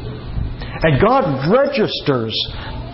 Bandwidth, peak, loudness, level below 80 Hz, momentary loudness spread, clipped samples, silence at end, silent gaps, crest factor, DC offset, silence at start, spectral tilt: 5.8 kHz; -4 dBFS; -17 LUFS; -32 dBFS; 13 LU; under 0.1%; 0 s; none; 14 dB; under 0.1%; 0 s; -10 dB/octave